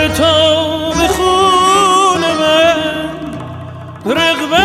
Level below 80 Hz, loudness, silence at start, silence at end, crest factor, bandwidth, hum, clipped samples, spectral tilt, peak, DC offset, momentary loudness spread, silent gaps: -34 dBFS; -11 LUFS; 0 s; 0 s; 10 dB; 15.5 kHz; none; under 0.1%; -3.5 dB/octave; -2 dBFS; under 0.1%; 16 LU; none